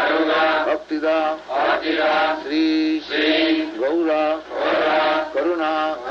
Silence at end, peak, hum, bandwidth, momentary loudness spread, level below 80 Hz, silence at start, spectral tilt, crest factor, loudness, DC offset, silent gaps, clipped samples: 0 s; -6 dBFS; none; 7 kHz; 5 LU; -56 dBFS; 0 s; -4 dB/octave; 12 dB; -20 LUFS; under 0.1%; none; under 0.1%